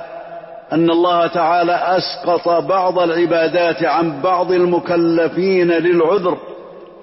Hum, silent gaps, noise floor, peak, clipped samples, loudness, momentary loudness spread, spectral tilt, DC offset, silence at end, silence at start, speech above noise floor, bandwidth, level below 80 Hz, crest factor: none; none; -36 dBFS; -6 dBFS; under 0.1%; -15 LUFS; 10 LU; -9.5 dB/octave; under 0.1%; 0 s; 0 s; 21 dB; 5.8 kHz; -60 dBFS; 10 dB